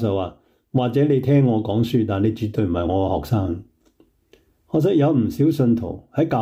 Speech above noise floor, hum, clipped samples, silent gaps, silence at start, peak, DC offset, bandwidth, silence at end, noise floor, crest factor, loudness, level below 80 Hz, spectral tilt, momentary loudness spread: 40 dB; none; under 0.1%; none; 0 s; -8 dBFS; under 0.1%; 16 kHz; 0 s; -59 dBFS; 12 dB; -20 LUFS; -48 dBFS; -9 dB/octave; 8 LU